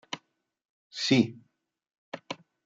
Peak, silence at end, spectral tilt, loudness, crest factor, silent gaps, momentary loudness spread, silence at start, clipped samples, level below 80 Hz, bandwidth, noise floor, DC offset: -10 dBFS; 0.3 s; -5 dB/octave; -26 LUFS; 22 dB; 0.65-0.90 s, 1.98-2.12 s; 20 LU; 0.1 s; under 0.1%; -76 dBFS; 7.8 kHz; -66 dBFS; under 0.1%